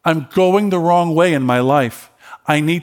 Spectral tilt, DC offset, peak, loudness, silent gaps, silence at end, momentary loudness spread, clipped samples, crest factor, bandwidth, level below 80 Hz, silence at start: -6.5 dB/octave; under 0.1%; 0 dBFS; -15 LUFS; none; 0 s; 4 LU; under 0.1%; 14 dB; 18 kHz; -62 dBFS; 0.05 s